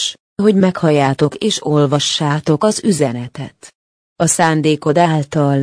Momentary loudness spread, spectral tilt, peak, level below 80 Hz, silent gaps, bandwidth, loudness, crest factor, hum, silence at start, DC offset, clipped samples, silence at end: 7 LU; -5 dB/octave; 0 dBFS; -54 dBFS; 0.20-0.36 s, 3.75-4.16 s; 10.5 kHz; -15 LUFS; 14 dB; none; 0 s; under 0.1%; under 0.1%; 0 s